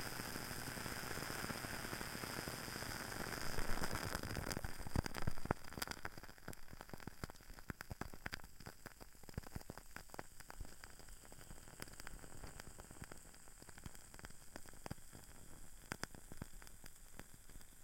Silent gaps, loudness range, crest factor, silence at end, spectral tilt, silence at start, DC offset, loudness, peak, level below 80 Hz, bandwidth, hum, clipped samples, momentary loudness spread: none; 11 LU; 28 dB; 0 s; -3.5 dB/octave; 0 s; under 0.1%; -49 LUFS; -18 dBFS; -54 dBFS; 17 kHz; none; under 0.1%; 14 LU